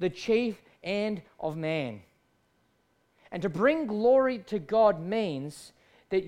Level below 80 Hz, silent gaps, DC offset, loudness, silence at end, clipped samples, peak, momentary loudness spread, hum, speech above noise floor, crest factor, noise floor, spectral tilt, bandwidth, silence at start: -64 dBFS; none; under 0.1%; -28 LUFS; 0 s; under 0.1%; -12 dBFS; 15 LU; none; 43 dB; 18 dB; -70 dBFS; -6.5 dB/octave; 12.5 kHz; 0 s